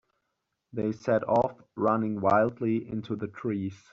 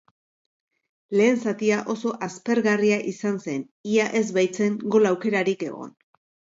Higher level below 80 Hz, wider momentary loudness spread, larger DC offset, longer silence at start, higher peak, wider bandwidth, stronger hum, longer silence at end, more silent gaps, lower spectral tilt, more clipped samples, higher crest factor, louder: first, -66 dBFS vs -74 dBFS; about the same, 9 LU vs 11 LU; neither; second, 0.75 s vs 1.1 s; second, -10 dBFS vs -6 dBFS; about the same, 7.4 kHz vs 7.8 kHz; neither; second, 0.15 s vs 0.7 s; second, none vs 3.71-3.84 s; first, -7.5 dB/octave vs -5.5 dB/octave; neither; about the same, 18 dB vs 18 dB; second, -28 LUFS vs -23 LUFS